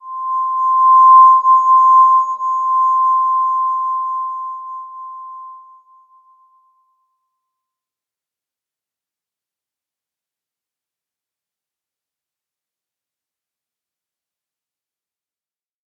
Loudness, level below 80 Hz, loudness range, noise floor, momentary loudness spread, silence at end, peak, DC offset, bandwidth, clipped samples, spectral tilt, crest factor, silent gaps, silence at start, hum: -12 LUFS; under -90 dBFS; 20 LU; under -90 dBFS; 23 LU; 10.45 s; -2 dBFS; under 0.1%; 7 kHz; under 0.1%; -1.5 dB/octave; 16 dB; none; 0.05 s; none